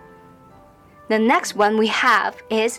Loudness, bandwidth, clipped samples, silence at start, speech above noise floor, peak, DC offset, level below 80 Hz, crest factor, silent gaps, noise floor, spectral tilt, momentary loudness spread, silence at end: -18 LUFS; 16 kHz; under 0.1%; 1.1 s; 30 dB; -6 dBFS; under 0.1%; -60 dBFS; 14 dB; none; -48 dBFS; -3 dB/octave; 6 LU; 0 s